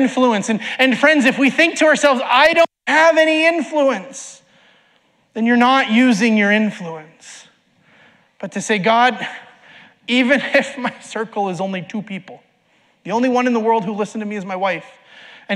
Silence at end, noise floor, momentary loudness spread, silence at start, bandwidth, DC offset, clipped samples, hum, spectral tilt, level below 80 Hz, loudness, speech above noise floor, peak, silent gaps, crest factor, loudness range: 0 s; -58 dBFS; 18 LU; 0 s; 12.5 kHz; under 0.1%; under 0.1%; none; -4 dB/octave; -66 dBFS; -16 LUFS; 42 dB; -2 dBFS; none; 16 dB; 8 LU